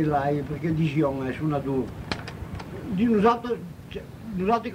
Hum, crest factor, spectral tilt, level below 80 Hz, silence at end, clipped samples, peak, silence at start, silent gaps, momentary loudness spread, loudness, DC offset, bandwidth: none; 18 dB; -8 dB/octave; -46 dBFS; 0 s; under 0.1%; -8 dBFS; 0 s; none; 15 LU; -26 LUFS; under 0.1%; 16 kHz